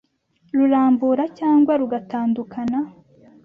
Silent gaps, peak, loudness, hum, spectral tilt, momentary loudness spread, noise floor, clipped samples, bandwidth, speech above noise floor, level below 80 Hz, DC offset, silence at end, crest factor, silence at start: none; -8 dBFS; -20 LUFS; none; -8.5 dB/octave; 9 LU; -61 dBFS; under 0.1%; 5.2 kHz; 43 dB; -62 dBFS; under 0.1%; 0.55 s; 12 dB; 0.55 s